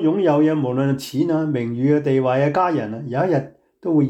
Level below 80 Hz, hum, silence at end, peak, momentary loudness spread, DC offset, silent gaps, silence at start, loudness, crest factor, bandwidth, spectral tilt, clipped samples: -62 dBFS; none; 0 s; -6 dBFS; 7 LU; under 0.1%; none; 0 s; -19 LUFS; 12 dB; 13 kHz; -8 dB/octave; under 0.1%